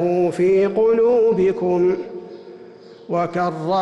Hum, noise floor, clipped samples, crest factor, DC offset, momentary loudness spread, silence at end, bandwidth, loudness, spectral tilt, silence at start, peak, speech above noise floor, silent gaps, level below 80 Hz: none; -41 dBFS; under 0.1%; 8 dB; under 0.1%; 17 LU; 0 s; 9 kHz; -18 LUFS; -8 dB/octave; 0 s; -10 dBFS; 24 dB; none; -58 dBFS